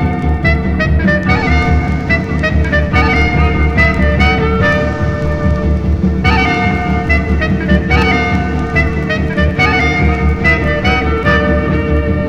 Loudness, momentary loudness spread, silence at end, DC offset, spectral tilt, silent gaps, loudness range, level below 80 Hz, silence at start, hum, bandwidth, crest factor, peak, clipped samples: -12 LUFS; 4 LU; 0 s; under 0.1%; -7 dB/octave; none; 1 LU; -18 dBFS; 0 s; none; 7.4 kHz; 12 dB; 0 dBFS; under 0.1%